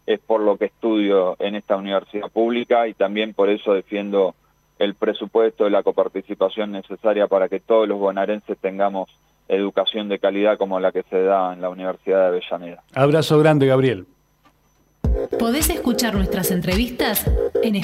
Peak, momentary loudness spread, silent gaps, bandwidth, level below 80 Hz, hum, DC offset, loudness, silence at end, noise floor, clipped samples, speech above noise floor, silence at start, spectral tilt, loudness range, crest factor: -2 dBFS; 7 LU; none; 16 kHz; -36 dBFS; none; under 0.1%; -20 LUFS; 0 s; -60 dBFS; under 0.1%; 41 dB; 0.1 s; -5.5 dB/octave; 2 LU; 18 dB